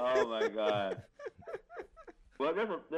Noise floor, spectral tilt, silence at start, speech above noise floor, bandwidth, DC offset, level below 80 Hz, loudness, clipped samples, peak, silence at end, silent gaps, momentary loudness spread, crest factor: -57 dBFS; -5 dB/octave; 0 s; 23 dB; 9.2 kHz; under 0.1%; -68 dBFS; -34 LUFS; under 0.1%; -18 dBFS; 0 s; none; 18 LU; 18 dB